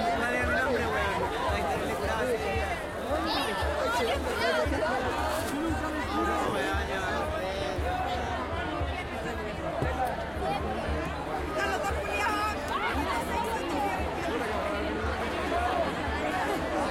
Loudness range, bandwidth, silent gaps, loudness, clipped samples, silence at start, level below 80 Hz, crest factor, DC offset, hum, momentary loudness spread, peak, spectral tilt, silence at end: 3 LU; 16.5 kHz; none; -30 LUFS; under 0.1%; 0 s; -42 dBFS; 14 dB; under 0.1%; none; 5 LU; -14 dBFS; -5 dB/octave; 0 s